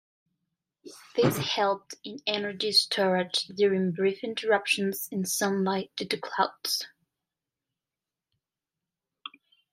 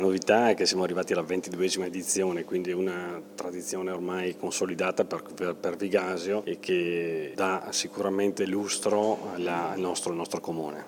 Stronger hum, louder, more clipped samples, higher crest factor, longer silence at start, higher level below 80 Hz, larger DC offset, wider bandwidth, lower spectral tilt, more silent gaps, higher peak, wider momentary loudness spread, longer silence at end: neither; about the same, -27 LUFS vs -29 LUFS; neither; about the same, 22 dB vs 22 dB; first, 0.85 s vs 0 s; about the same, -72 dBFS vs -76 dBFS; neither; second, 16 kHz vs 19 kHz; about the same, -3.5 dB/octave vs -3.5 dB/octave; neither; about the same, -8 dBFS vs -8 dBFS; first, 11 LU vs 8 LU; first, 0.45 s vs 0 s